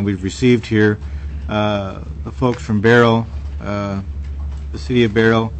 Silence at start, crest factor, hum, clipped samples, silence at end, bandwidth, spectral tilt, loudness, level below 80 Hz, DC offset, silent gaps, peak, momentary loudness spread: 0 s; 16 dB; none; under 0.1%; 0 s; 8.6 kHz; -7 dB/octave; -17 LUFS; -30 dBFS; under 0.1%; none; -2 dBFS; 15 LU